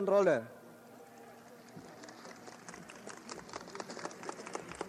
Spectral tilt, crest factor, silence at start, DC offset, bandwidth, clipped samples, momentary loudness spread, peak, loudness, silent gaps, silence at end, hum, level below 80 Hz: -4.5 dB/octave; 22 dB; 0 s; under 0.1%; 15.5 kHz; under 0.1%; 22 LU; -16 dBFS; -38 LUFS; none; 0 s; none; -76 dBFS